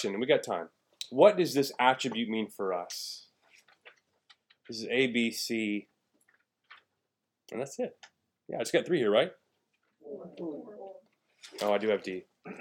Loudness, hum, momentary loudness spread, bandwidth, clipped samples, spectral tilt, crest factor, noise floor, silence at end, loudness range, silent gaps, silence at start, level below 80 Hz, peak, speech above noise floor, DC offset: -30 LUFS; none; 19 LU; 18 kHz; under 0.1%; -4 dB/octave; 24 dB; -85 dBFS; 0 s; 7 LU; none; 0 s; -86 dBFS; -8 dBFS; 55 dB; under 0.1%